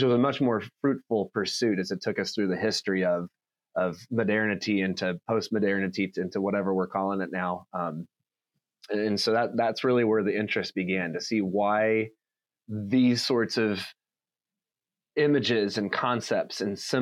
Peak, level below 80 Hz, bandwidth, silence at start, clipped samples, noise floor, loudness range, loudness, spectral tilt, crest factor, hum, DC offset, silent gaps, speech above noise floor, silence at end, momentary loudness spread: -12 dBFS; -78 dBFS; 14 kHz; 0 s; under 0.1%; under -90 dBFS; 3 LU; -27 LUFS; -5.5 dB/octave; 16 dB; none; under 0.1%; none; over 63 dB; 0 s; 8 LU